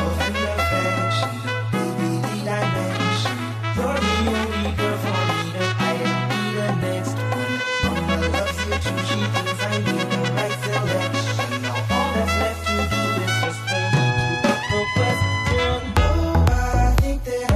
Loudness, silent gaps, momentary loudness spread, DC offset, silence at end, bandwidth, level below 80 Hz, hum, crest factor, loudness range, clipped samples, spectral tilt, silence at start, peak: -22 LUFS; none; 4 LU; under 0.1%; 0 s; 14.5 kHz; -30 dBFS; none; 16 dB; 2 LU; under 0.1%; -5 dB/octave; 0 s; -4 dBFS